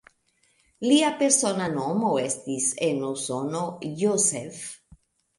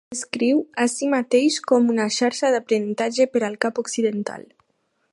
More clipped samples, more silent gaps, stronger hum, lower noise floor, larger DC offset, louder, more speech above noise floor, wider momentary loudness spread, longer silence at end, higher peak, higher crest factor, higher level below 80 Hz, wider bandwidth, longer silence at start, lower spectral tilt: neither; neither; neither; about the same, -67 dBFS vs -70 dBFS; neither; second, -24 LUFS vs -21 LUFS; second, 42 dB vs 49 dB; first, 11 LU vs 6 LU; about the same, 0.65 s vs 0.7 s; second, -6 dBFS vs -2 dBFS; about the same, 22 dB vs 20 dB; first, -66 dBFS vs -74 dBFS; about the same, 11.5 kHz vs 11.5 kHz; first, 0.8 s vs 0.1 s; about the same, -3.5 dB/octave vs -3.5 dB/octave